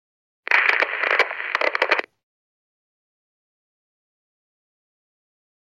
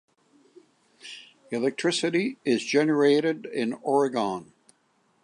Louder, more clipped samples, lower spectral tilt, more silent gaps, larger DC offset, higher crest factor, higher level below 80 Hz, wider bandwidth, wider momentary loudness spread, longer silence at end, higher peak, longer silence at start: first, -20 LUFS vs -25 LUFS; neither; second, 0 dB/octave vs -4.5 dB/octave; neither; neither; first, 26 dB vs 18 dB; second, under -90 dBFS vs -78 dBFS; first, 13 kHz vs 10.5 kHz; second, 6 LU vs 21 LU; first, 3.75 s vs 0.8 s; first, 0 dBFS vs -10 dBFS; second, 0.5 s vs 1.05 s